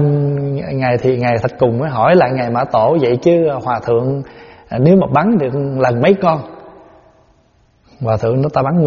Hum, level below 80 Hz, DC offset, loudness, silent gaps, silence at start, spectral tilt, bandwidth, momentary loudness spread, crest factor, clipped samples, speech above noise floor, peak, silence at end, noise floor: none; -46 dBFS; under 0.1%; -14 LUFS; none; 0 s; -7 dB/octave; 7 kHz; 8 LU; 14 dB; under 0.1%; 40 dB; 0 dBFS; 0 s; -53 dBFS